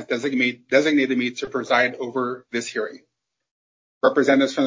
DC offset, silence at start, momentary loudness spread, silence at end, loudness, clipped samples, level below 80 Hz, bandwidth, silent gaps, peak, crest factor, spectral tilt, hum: under 0.1%; 0 s; 10 LU; 0 s; -21 LUFS; under 0.1%; -68 dBFS; 7.6 kHz; 3.51-4.01 s; -4 dBFS; 18 dB; -4 dB/octave; none